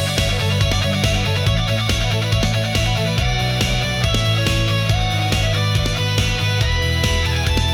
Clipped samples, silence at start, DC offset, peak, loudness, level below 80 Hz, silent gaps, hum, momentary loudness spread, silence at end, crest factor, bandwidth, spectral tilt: under 0.1%; 0 s; under 0.1%; -6 dBFS; -18 LUFS; -26 dBFS; none; none; 1 LU; 0 s; 12 dB; 17 kHz; -4.5 dB/octave